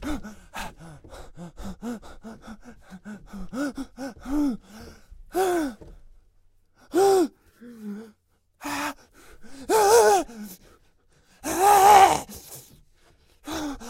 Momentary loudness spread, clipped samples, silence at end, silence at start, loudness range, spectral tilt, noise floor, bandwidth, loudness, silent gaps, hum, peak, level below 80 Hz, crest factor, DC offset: 26 LU; under 0.1%; 0 s; 0 s; 18 LU; -3 dB/octave; -65 dBFS; 16 kHz; -21 LUFS; none; none; -2 dBFS; -48 dBFS; 24 dB; under 0.1%